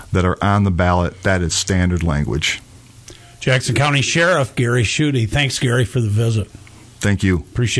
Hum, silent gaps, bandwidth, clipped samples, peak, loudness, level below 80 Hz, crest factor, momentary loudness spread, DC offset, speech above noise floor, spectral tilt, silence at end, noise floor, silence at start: none; none; 11 kHz; under 0.1%; -2 dBFS; -17 LUFS; -34 dBFS; 14 dB; 5 LU; under 0.1%; 24 dB; -5 dB/octave; 0 s; -41 dBFS; 0 s